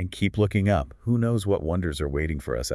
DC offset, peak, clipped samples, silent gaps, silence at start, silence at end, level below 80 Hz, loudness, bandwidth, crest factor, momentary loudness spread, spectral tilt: under 0.1%; -10 dBFS; under 0.1%; none; 0 s; 0 s; -38 dBFS; -25 LUFS; 12 kHz; 14 dB; 5 LU; -6.5 dB/octave